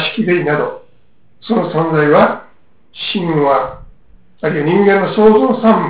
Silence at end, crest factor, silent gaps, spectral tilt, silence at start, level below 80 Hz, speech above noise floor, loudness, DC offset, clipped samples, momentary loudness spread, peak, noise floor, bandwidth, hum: 0 s; 14 dB; none; -10.5 dB/octave; 0 s; -48 dBFS; 43 dB; -13 LUFS; 0.7%; under 0.1%; 13 LU; 0 dBFS; -55 dBFS; 4 kHz; none